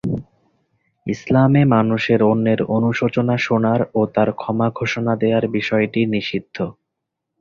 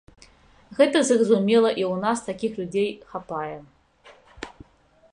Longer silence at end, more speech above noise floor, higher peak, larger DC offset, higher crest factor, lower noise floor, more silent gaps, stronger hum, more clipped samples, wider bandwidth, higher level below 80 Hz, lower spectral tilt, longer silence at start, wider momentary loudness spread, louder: about the same, 0.7 s vs 0.65 s; first, 62 dB vs 36 dB; about the same, -2 dBFS vs -4 dBFS; neither; about the same, 16 dB vs 20 dB; first, -79 dBFS vs -58 dBFS; neither; neither; neither; second, 7 kHz vs 11 kHz; first, -52 dBFS vs -60 dBFS; first, -7.5 dB/octave vs -4.5 dB/octave; second, 0.05 s vs 0.7 s; second, 12 LU vs 22 LU; first, -18 LUFS vs -22 LUFS